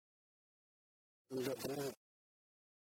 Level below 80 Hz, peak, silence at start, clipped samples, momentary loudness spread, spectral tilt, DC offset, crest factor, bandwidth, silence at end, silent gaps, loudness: -84 dBFS; -28 dBFS; 1.3 s; under 0.1%; 8 LU; -4.5 dB/octave; under 0.1%; 20 dB; 16.5 kHz; 0.95 s; none; -44 LUFS